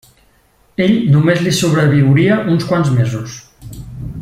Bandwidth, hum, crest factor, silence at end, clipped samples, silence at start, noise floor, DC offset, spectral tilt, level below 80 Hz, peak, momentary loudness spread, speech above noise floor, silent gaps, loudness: 15 kHz; none; 12 dB; 0 s; under 0.1%; 0.8 s; -53 dBFS; under 0.1%; -6.5 dB/octave; -42 dBFS; -2 dBFS; 20 LU; 41 dB; none; -13 LUFS